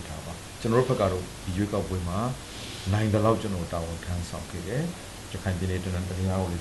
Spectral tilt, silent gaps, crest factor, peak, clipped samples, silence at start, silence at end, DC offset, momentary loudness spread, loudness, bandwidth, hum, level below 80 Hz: -6 dB/octave; none; 18 dB; -10 dBFS; under 0.1%; 0 s; 0 s; under 0.1%; 12 LU; -29 LUFS; 12.5 kHz; none; -46 dBFS